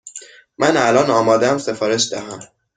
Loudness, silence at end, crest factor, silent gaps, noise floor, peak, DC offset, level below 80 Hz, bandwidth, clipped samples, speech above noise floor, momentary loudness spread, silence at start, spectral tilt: -16 LUFS; 0.3 s; 16 dB; none; -39 dBFS; -2 dBFS; under 0.1%; -58 dBFS; 9.6 kHz; under 0.1%; 22 dB; 20 LU; 0.05 s; -3.5 dB/octave